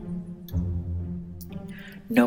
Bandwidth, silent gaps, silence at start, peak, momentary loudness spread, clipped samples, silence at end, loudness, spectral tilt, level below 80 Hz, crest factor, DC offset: 17 kHz; none; 0 s; -6 dBFS; 10 LU; under 0.1%; 0 s; -33 LUFS; -7.5 dB/octave; -42 dBFS; 22 dB; under 0.1%